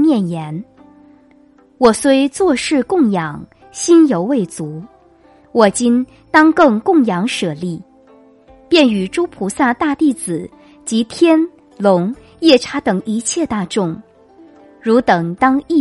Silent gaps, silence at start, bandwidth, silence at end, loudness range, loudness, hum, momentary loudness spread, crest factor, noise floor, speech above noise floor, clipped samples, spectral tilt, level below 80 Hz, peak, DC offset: none; 0 s; 11.5 kHz; 0 s; 3 LU; -15 LUFS; none; 14 LU; 16 dB; -48 dBFS; 34 dB; under 0.1%; -5 dB/octave; -52 dBFS; 0 dBFS; under 0.1%